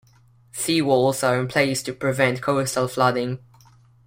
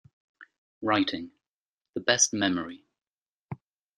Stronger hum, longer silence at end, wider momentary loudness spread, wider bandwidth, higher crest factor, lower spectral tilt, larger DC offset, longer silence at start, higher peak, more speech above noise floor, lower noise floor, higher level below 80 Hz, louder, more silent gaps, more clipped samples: neither; first, 0.7 s vs 0.4 s; second, 9 LU vs 22 LU; first, 16.5 kHz vs 12 kHz; second, 18 dB vs 26 dB; first, -4.5 dB/octave vs -2 dB/octave; neither; first, 0.55 s vs 0.4 s; about the same, -4 dBFS vs -6 dBFS; second, 34 dB vs over 63 dB; second, -55 dBFS vs under -90 dBFS; first, -60 dBFS vs -70 dBFS; first, -21 LUFS vs -26 LUFS; second, none vs 0.58-0.81 s, 1.48-1.81 s, 3.07-3.17 s, 3.28-3.49 s; neither